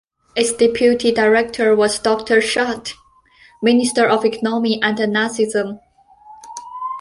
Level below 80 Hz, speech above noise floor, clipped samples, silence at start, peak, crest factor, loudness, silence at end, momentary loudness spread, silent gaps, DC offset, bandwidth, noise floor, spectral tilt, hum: -54 dBFS; 34 dB; under 0.1%; 0.35 s; 0 dBFS; 16 dB; -17 LUFS; 0 s; 13 LU; none; under 0.1%; 11.5 kHz; -50 dBFS; -3.5 dB/octave; none